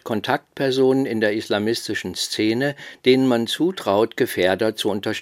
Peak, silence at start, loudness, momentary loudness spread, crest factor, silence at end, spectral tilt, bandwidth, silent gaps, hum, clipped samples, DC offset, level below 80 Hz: -2 dBFS; 0.05 s; -21 LUFS; 7 LU; 18 dB; 0 s; -4.5 dB/octave; 16.5 kHz; none; none; under 0.1%; under 0.1%; -68 dBFS